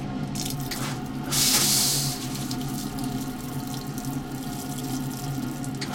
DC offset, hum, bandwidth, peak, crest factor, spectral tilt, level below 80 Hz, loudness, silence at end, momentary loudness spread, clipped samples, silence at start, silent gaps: under 0.1%; none; 17 kHz; -8 dBFS; 20 dB; -3 dB/octave; -46 dBFS; -26 LUFS; 0 s; 13 LU; under 0.1%; 0 s; none